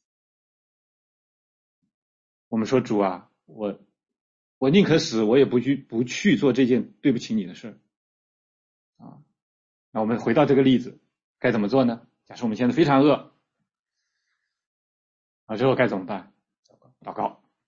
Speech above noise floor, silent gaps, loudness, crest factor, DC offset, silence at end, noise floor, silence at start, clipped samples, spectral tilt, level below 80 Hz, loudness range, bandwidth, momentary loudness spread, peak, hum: 60 dB; 4.21-4.61 s, 7.97-8.93 s, 9.42-9.92 s, 11.24-11.35 s, 13.79-13.84 s, 14.67-15.47 s, 16.59-16.63 s; -22 LUFS; 20 dB; under 0.1%; 0.35 s; -82 dBFS; 2.5 s; under 0.1%; -6.5 dB/octave; -62 dBFS; 8 LU; 7.6 kHz; 17 LU; -6 dBFS; none